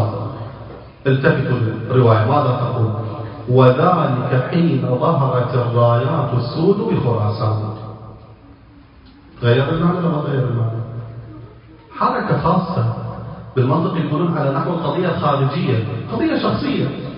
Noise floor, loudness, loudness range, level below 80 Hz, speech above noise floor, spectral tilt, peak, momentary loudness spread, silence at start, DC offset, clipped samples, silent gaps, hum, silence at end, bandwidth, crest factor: -44 dBFS; -18 LUFS; 5 LU; -46 dBFS; 28 dB; -11.5 dB/octave; 0 dBFS; 14 LU; 0 s; under 0.1%; under 0.1%; none; none; 0 s; 5.4 kHz; 18 dB